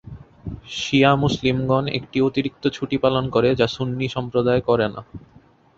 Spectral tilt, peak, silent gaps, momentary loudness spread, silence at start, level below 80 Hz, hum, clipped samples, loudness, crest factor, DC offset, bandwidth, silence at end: -6.5 dB/octave; -2 dBFS; none; 11 LU; 0.05 s; -46 dBFS; none; under 0.1%; -21 LUFS; 20 dB; under 0.1%; 7.8 kHz; 0.6 s